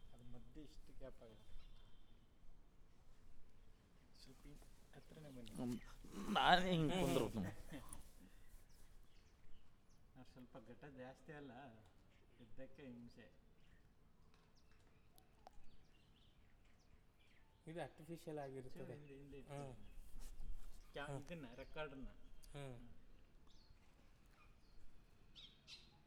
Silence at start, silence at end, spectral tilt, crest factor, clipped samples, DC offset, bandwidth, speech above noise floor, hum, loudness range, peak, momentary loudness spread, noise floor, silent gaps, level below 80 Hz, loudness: 0 s; 0 s; -5 dB/octave; 30 dB; under 0.1%; under 0.1%; 18.5 kHz; 23 dB; none; 24 LU; -20 dBFS; 26 LU; -69 dBFS; none; -62 dBFS; -46 LUFS